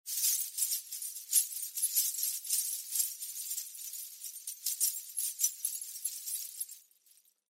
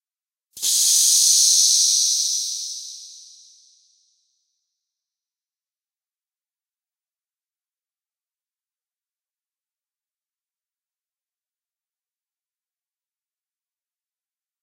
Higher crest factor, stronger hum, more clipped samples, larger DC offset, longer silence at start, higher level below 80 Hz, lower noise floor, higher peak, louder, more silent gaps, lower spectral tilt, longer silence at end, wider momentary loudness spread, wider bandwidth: about the same, 24 dB vs 22 dB; neither; neither; neither; second, 0.05 s vs 0.55 s; about the same, under -90 dBFS vs -86 dBFS; second, -67 dBFS vs under -90 dBFS; second, -14 dBFS vs -4 dBFS; second, -33 LUFS vs -15 LUFS; neither; second, 9 dB/octave vs 6.5 dB/octave; second, 0.7 s vs 11.45 s; second, 12 LU vs 18 LU; about the same, 16.5 kHz vs 16 kHz